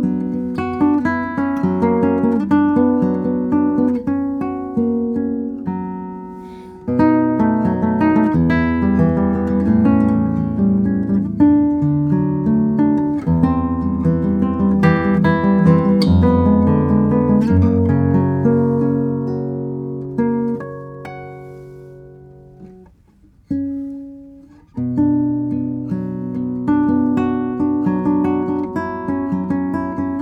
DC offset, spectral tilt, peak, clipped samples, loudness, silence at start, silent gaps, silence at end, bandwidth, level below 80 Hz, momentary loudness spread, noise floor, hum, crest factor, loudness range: under 0.1%; -10 dB/octave; 0 dBFS; under 0.1%; -17 LUFS; 0 s; none; 0 s; 5.6 kHz; -42 dBFS; 11 LU; -50 dBFS; none; 16 dB; 11 LU